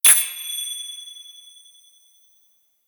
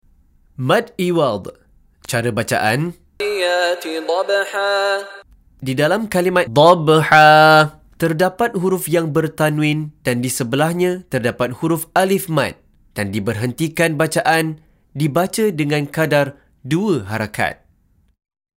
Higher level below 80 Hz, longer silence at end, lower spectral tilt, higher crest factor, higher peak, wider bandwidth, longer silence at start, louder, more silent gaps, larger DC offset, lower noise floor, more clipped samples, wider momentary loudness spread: second, -72 dBFS vs -52 dBFS; first, 1.55 s vs 1.05 s; second, 4.5 dB/octave vs -5 dB/octave; first, 24 dB vs 18 dB; about the same, 0 dBFS vs 0 dBFS; first, over 20 kHz vs 16 kHz; second, 0.05 s vs 0.6 s; second, -20 LUFS vs -17 LUFS; neither; neither; first, -62 dBFS vs -57 dBFS; neither; first, 26 LU vs 12 LU